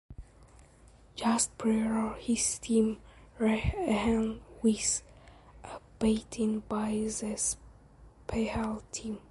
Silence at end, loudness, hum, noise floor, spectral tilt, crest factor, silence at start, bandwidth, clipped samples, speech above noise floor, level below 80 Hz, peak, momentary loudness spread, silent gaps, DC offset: 0.1 s; -31 LUFS; none; -57 dBFS; -4 dB/octave; 16 dB; 0.1 s; 11.5 kHz; under 0.1%; 27 dB; -48 dBFS; -16 dBFS; 12 LU; none; under 0.1%